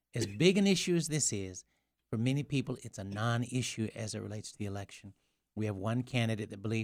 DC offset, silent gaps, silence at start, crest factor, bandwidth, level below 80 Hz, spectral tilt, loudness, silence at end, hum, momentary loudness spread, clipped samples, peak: under 0.1%; none; 0.15 s; 24 dB; 15.5 kHz; -66 dBFS; -5 dB/octave; -34 LUFS; 0 s; none; 14 LU; under 0.1%; -10 dBFS